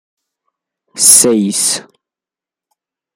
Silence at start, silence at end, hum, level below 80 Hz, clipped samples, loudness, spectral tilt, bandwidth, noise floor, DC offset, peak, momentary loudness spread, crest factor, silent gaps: 0.95 s; 1.35 s; none; -60 dBFS; 0.5%; -9 LUFS; -2 dB/octave; over 20 kHz; -88 dBFS; under 0.1%; 0 dBFS; 10 LU; 16 dB; none